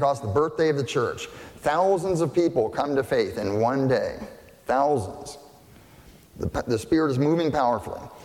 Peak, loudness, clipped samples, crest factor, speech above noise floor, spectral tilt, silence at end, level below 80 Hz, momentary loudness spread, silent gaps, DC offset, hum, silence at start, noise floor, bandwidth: -10 dBFS; -24 LUFS; under 0.1%; 14 dB; 27 dB; -6.5 dB/octave; 0 s; -52 dBFS; 15 LU; none; under 0.1%; none; 0 s; -50 dBFS; 16.5 kHz